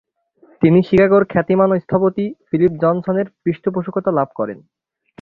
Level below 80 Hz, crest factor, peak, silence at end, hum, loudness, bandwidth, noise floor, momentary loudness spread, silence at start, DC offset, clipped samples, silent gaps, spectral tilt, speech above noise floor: -52 dBFS; 16 dB; -2 dBFS; 0.65 s; none; -17 LUFS; 5 kHz; -53 dBFS; 10 LU; 0.6 s; under 0.1%; under 0.1%; none; -10.5 dB/octave; 37 dB